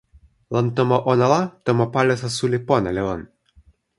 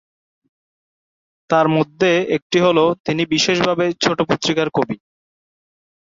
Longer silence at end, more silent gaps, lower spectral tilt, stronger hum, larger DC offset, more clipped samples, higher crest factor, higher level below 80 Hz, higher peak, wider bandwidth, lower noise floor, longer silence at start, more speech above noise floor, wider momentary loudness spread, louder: second, 0.75 s vs 1.15 s; second, none vs 2.42-2.50 s, 3.00-3.04 s; first, -6.5 dB/octave vs -4.5 dB/octave; neither; neither; neither; about the same, 18 dB vs 18 dB; first, -50 dBFS vs -58 dBFS; about the same, -2 dBFS vs -2 dBFS; first, 11.5 kHz vs 7.8 kHz; second, -55 dBFS vs under -90 dBFS; second, 0.5 s vs 1.5 s; second, 35 dB vs over 73 dB; first, 8 LU vs 5 LU; second, -20 LUFS vs -17 LUFS